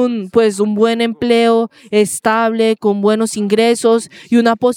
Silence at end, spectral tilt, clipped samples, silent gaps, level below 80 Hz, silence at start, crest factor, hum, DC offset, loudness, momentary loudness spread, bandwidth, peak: 0 s; -4.5 dB/octave; under 0.1%; none; -58 dBFS; 0 s; 12 dB; none; under 0.1%; -14 LUFS; 4 LU; 16 kHz; 0 dBFS